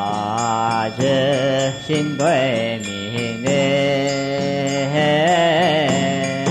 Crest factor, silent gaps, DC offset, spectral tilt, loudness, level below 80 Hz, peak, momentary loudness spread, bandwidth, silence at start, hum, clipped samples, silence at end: 12 dB; none; under 0.1%; -5 dB/octave; -18 LUFS; -56 dBFS; -6 dBFS; 6 LU; 12 kHz; 0 s; none; under 0.1%; 0 s